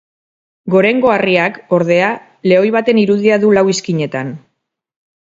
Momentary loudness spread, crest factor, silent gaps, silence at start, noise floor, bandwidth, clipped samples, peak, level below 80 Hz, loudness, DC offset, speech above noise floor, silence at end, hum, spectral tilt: 9 LU; 14 dB; none; 0.65 s; -70 dBFS; 7.8 kHz; under 0.1%; 0 dBFS; -58 dBFS; -13 LUFS; under 0.1%; 58 dB; 0.8 s; none; -5.5 dB/octave